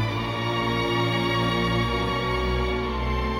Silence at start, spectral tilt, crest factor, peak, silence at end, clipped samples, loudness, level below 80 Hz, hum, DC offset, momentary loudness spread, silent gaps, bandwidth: 0 s; -6 dB/octave; 12 dB; -12 dBFS; 0 s; under 0.1%; -24 LUFS; -34 dBFS; none; under 0.1%; 3 LU; none; 16 kHz